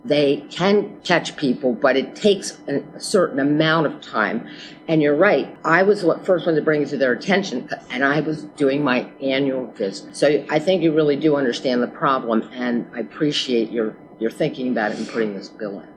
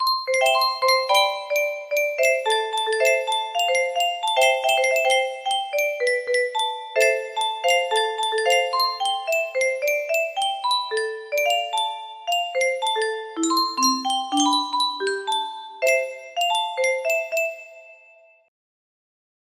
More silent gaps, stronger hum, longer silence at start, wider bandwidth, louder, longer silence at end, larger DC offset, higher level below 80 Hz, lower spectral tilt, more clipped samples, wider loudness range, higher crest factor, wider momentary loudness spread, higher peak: neither; neither; about the same, 0.05 s vs 0 s; second, 12 kHz vs 15.5 kHz; about the same, -20 LUFS vs -21 LUFS; second, 0.05 s vs 1.55 s; neither; first, -66 dBFS vs -74 dBFS; first, -5 dB/octave vs 0.5 dB/octave; neither; about the same, 4 LU vs 3 LU; about the same, 20 dB vs 18 dB; first, 10 LU vs 6 LU; first, 0 dBFS vs -6 dBFS